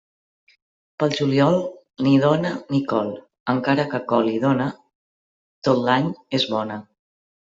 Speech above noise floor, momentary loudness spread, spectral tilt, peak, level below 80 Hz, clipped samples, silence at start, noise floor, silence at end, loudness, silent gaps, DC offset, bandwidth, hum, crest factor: over 70 dB; 10 LU; -7 dB/octave; -4 dBFS; -62 dBFS; under 0.1%; 1 s; under -90 dBFS; 0.75 s; -21 LUFS; 3.40-3.46 s, 4.95-5.62 s; under 0.1%; 7.6 kHz; none; 18 dB